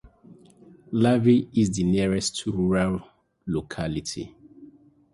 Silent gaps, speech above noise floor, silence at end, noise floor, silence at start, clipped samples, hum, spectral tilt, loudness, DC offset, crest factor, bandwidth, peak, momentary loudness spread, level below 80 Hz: none; 29 dB; 0.5 s; -52 dBFS; 0.3 s; under 0.1%; none; -6 dB/octave; -24 LUFS; under 0.1%; 18 dB; 11.5 kHz; -8 dBFS; 14 LU; -48 dBFS